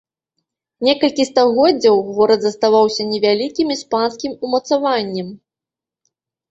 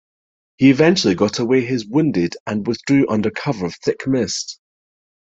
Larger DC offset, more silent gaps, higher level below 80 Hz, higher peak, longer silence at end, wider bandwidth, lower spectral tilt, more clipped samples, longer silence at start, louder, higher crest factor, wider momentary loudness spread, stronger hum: neither; second, none vs 2.40-2.46 s; about the same, -60 dBFS vs -56 dBFS; about the same, -2 dBFS vs -2 dBFS; first, 1.15 s vs 0.75 s; about the same, 8 kHz vs 8 kHz; about the same, -4.5 dB/octave vs -5.5 dB/octave; neither; first, 0.8 s vs 0.6 s; about the same, -16 LUFS vs -18 LUFS; about the same, 16 dB vs 18 dB; about the same, 8 LU vs 9 LU; neither